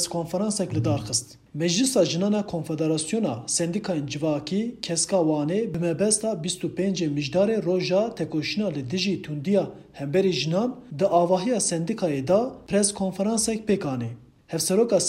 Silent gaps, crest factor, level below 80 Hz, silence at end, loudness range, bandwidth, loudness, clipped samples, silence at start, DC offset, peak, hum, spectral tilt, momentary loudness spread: none; 18 dB; -58 dBFS; 0 s; 2 LU; 16 kHz; -25 LUFS; under 0.1%; 0 s; under 0.1%; -6 dBFS; none; -4.5 dB/octave; 6 LU